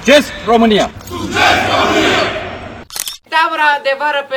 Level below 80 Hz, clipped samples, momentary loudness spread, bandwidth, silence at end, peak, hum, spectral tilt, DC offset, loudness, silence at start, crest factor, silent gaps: -40 dBFS; 0.1%; 13 LU; 20 kHz; 0 s; 0 dBFS; none; -3.5 dB/octave; under 0.1%; -13 LUFS; 0 s; 14 dB; none